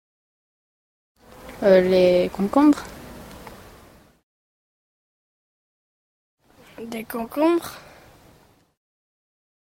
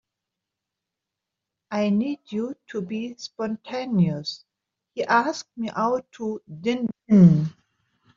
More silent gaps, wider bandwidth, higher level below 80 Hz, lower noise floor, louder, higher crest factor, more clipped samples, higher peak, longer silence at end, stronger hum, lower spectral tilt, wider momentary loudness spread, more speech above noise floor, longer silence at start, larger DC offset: first, 4.23-6.37 s vs none; first, 16.5 kHz vs 7.4 kHz; first, -54 dBFS vs -64 dBFS; second, -56 dBFS vs -85 dBFS; first, -19 LUFS vs -24 LUFS; about the same, 22 dB vs 20 dB; neither; about the same, -4 dBFS vs -4 dBFS; first, 2 s vs 0.65 s; neither; about the same, -6.5 dB/octave vs -6.5 dB/octave; first, 25 LU vs 16 LU; second, 37 dB vs 63 dB; second, 1.45 s vs 1.7 s; neither